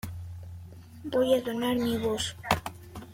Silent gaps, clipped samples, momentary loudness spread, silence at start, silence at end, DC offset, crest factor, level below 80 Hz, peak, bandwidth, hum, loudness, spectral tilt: none; under 0.1%; 19 LU; 0.05 s; 0 s; under 0.1%; 24 dB; -54 dBFS; -6 dBFS; 16.5 kHz; none; -28 LUFS; -5 dB/octave